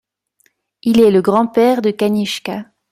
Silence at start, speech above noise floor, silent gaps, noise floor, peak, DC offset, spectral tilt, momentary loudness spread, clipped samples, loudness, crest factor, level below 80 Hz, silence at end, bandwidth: 0.85 s; 47 dB; none; -61 dBFS; 0 dBFS; under 0.1%; -6 dB/octave; 12 LU; under 0.1%; -14 LUFS; 14 dB; -56 dBFS; 0.3 s; 15.5 kHz